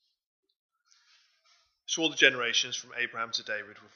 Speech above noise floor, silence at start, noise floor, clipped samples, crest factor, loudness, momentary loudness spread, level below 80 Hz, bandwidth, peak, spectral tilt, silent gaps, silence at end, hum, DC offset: 38 dB; 1.9 s; -68 dBFS; under 0.1%; 28 dB; -28 LUFS; 14 LU; -86 dBFS; 7.4 kHz; -4 dBFS; -0.5 dB/octave; none; 0.2 s; none; under 0.1%